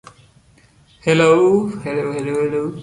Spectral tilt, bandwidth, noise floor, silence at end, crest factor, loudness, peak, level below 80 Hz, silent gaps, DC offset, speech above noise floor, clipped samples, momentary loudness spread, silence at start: -6 dB/octave; 11.5 kHz; -52 dBFS; 0 s; 16 dB; -17 LUFS; -2 dBFS; -54 dBFS; none; under 0.1%; 36 dB; under 0.1%; 11 LU; 1.05 s